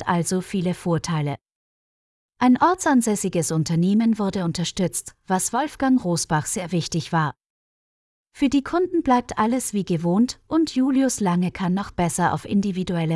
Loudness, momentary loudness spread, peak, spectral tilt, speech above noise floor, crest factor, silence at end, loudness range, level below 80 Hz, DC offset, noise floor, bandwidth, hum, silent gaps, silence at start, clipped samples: -22 LUFS; 6 LU; -6 dBFS; -5.5 dB/octave; over 69 dB; 16 dB; 0 s; 3 LU; -52 dBFS; under 0.1%; under -90 dBFS; 12 kHz; none; 1.55-2.29 s, 7.46-8.25 s; 0 s; under 0.1%